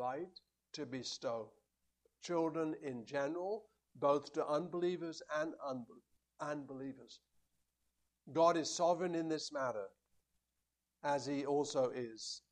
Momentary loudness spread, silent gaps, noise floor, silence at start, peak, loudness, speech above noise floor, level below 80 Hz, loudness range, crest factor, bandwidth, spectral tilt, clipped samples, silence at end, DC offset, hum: 14 LU; none; -88 dBFS; 0 s; -20 dBFS; -39 LUFS; 49 dB; -84 dBFS; 5 LU; 20 dB; 10.5 kHz; -4.5 dB/octave; under 0.1%; 0.1 s; under 0.1%; none